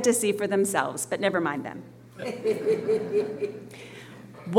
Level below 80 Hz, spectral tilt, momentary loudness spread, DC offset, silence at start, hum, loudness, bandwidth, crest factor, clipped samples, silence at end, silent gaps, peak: -70 dBFS; -4 dB/octave; 19 LU; under 0.1%; 0 s; none; -27 LUFS; 17 kHz; 20 dB; under 0.1%; 0 s; none; -6 dBFS